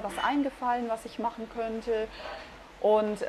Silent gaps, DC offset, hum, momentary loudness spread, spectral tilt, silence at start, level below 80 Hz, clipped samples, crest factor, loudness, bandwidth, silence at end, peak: none; under 0.1%; none; 15 LU; -5 dB/octave; 0 s; -56 dBFS; under 0.1%; 16 dB; -30 LUFS; 13 kHz; 0 s; -14 dBFS